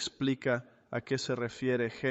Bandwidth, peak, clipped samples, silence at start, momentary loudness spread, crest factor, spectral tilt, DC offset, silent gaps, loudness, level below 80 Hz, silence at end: 8.4 kHz; -18 dBFS; under 0.1%; 0 s; 6 LU; 14 dB; -5 dB/octave; under 0.1%; none; -33 LUFS; -68 dBFS; 0 s